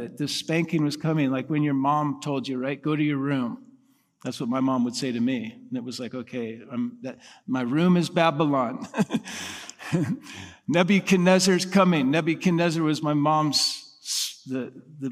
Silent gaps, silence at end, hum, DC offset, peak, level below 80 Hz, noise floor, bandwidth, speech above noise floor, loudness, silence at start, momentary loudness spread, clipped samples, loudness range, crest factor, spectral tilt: none; 0 s; none; under 0.1%; -4 dBFS; -70 dBFS; -60 dBFS; 15.5 kHz; 36 dB; -25 LUFS; 0 s; 14 LU; under 0.1%; 7 LU; 20 dB; -5 dB/octave